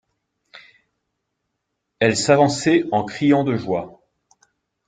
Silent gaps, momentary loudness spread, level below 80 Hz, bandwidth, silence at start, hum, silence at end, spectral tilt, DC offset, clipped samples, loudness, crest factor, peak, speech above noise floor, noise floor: none; 10 LU; -60 dBFS; 9.6 kHz; 0.55 s; none; 0.95 s; -5 dB/octave; under 0.1%; under 0.1%; -19 LUFS; 20 dB; -2 dBFS; 59 dB; -77 dBFS